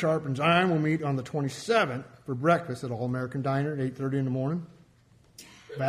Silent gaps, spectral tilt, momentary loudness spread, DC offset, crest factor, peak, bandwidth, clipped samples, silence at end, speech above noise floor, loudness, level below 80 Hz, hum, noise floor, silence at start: none; -6.5 dB/octave; 13 LU; under 0.1%; 18 dB; -10 dBFS; 13 kHz; under 0.1%; 0 s; 32 dB; -28 LUFS; -64 dBFS; none; -60 dBFS; 0 s